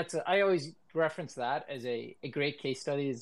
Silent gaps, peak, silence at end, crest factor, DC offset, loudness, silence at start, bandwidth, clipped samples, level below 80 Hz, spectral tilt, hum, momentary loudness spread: none; -16 dBFS; 0 s; 18 dB; under 0.1%; -33 LUFS; 0 s; 12 kHz; under 0.1%; -82 dBFS; -5 dB/octave; none; 10 LU